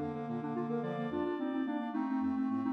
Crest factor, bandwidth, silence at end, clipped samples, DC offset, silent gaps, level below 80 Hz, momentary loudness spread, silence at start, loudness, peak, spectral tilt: 12 dB; 5.6 kHz; 0 s; under 0.1%; under 0.1%; none; -70 dBFS; 4 LU; 0 s; -36 LUFS; -24 dBFS; -9 dB/octave